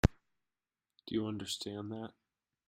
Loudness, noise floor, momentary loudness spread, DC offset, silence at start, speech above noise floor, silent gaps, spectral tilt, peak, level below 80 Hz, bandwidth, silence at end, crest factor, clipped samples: -39 LUFS; under -90 dBFS; 12 LU; under 0.1%; 0.05 s; over 50 dB; none; -5.5 dB/octave; -10 dBFS; -48 dBFS; 16 kHz; 0.6 s; 28 dB; under 0.1%